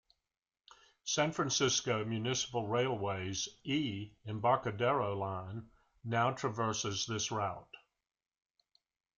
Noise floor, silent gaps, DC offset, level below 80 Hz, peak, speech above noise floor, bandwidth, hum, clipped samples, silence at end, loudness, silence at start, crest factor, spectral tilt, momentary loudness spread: under -90 dBFS; none; under 0.1%; -70 dBFS; -16 dBFS; over 55 dB; 10 kHz; none; under 0.1%; 1.4 s; -35 LUFS; 1.05 s; 20 dB; -3.5 dB/octave; 11 LU